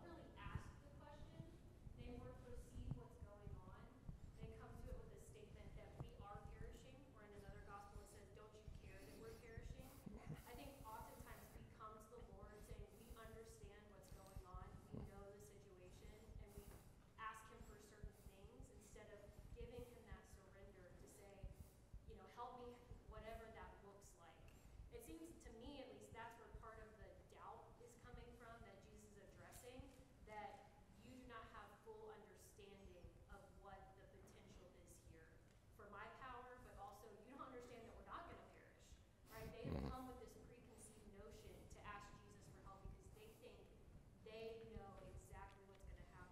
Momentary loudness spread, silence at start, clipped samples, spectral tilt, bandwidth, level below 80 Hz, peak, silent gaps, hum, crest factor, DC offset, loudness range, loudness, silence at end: 9 LU; 0 s; under 0.1%; -5.5 dB/octave; 16 kHz; -66 dBFS; -34 dBFS; none; none; 26 dB; under 0.1%; 5 LU; -61 LUFS; 0 s